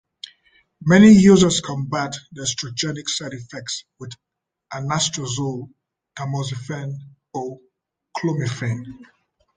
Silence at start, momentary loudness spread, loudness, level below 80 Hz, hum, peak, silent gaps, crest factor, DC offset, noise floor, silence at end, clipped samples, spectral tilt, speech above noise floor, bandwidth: 0.8 s; 23 LU; -19 LUFS; -52 dBFS; none; -2 dBFS; none; 20 dB; under 0.1%; -68 dBFS; 0.55 s; under 0.1%; -5 dB/octave; 49 dB; 9.6 kHz